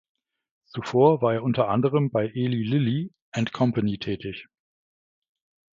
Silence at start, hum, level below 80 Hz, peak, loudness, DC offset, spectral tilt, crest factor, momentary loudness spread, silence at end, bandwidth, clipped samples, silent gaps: 0.75 s; none; -60 dBFS; -6 dBFS; -24 LUFS; under 0.1%; -8 dB/octave; 20 dB; 13 LU; 1.35 s; 7.6 kHz; under 0.1%; 3.22-3.32 s